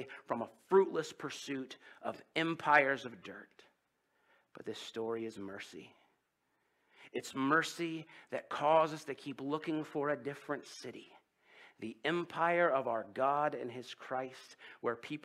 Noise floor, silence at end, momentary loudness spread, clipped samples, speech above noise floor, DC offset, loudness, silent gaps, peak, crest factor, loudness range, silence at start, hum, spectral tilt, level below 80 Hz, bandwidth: -80 dBFS; 0.05 s; 18 LU; under 0.1%; 44 dB; under 0.1%; -36 LUFS; none; -12 dBFS; 26 dB; 11 LU; 0 s; none; -4.5 dB/octave; -86 dBFS; 14 kHz